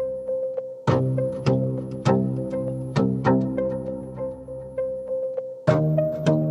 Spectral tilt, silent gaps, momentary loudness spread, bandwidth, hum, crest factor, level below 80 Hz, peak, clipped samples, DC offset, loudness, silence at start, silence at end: -8.5 dB/octave; none; 10 LU; 11.5 kHz; none; 20 dB; -50 dBFS; -4 dBFS; under 0.1%; under 0.1%; -25 LUFS; 0 s; 0 s